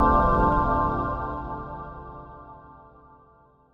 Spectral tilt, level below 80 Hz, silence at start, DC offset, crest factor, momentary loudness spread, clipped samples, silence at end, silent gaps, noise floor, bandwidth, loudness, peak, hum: -9.5 dB/octave; -34 dBFS; 0 s; under 0.1%; 18 dB; 23 LU; under 0.1%; 1 s; none; -57 dBFS; 5.6 kHz; -24 LUFS; -8 dBFS; none